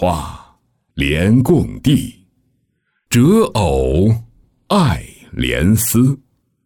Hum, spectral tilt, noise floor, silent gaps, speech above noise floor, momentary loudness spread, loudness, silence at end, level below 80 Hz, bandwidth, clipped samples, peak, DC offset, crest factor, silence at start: none; -6 dB/octave; -66 dBFS; none; 53 dB; 13 LU; -15 LUFS; 0.5 s; -32 dBFS; 19.5 kHz; under 0.1%; -2 dBFS; under 0.1%; 14 dB; 0 s